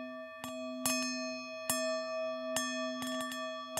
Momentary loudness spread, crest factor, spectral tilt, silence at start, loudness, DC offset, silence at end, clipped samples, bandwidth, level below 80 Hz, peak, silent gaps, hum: 9 LU; 24 dB; -1.5 dB/octave; 0 s; -36 LUFS; under 0.1%; 0 s; under 0.1%; 16 kHz; -78 dBFS; -14 dBFS; none; none